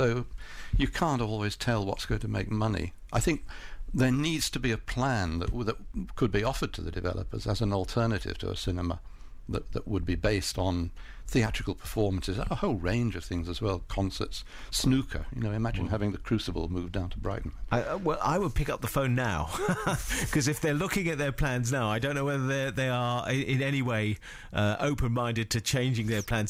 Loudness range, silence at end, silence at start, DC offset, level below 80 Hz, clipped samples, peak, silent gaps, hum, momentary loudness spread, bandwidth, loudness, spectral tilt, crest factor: 3 LU; 0 s; 0 s; under 0.1%; -40 dBFS; under 0.1%; -14 dBFS; none; none; 7 LU; 16 kHz; -30 LUFS; -5.5 dB/octave; 14 dB